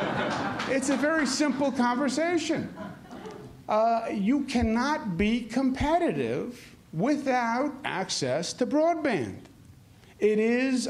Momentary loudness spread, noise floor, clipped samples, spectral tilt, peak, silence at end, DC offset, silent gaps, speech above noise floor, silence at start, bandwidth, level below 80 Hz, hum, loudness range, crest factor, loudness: 14 LU; -53 dBFS; under 0.1%; -4.5 dB/octave; -12 dBFS; 0 s; under 0.1%; none; 26 dB; 0 s; 13.5 kHz; -50 dBFS; none; 1 LU; 14 dB; -27 LUFS